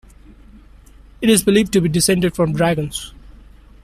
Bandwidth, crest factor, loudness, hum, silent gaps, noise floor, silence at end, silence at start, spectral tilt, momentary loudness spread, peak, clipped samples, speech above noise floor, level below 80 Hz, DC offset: 14.5 kHz; 16 dB; -16 LUFS; none; none; -44 dBFS; 0.5 s; 1.2 s; -4.5 dB/octave; 12 LU; -2 dBFS; under 0.1%; 28 dB; -42 dBFS; under 0.1%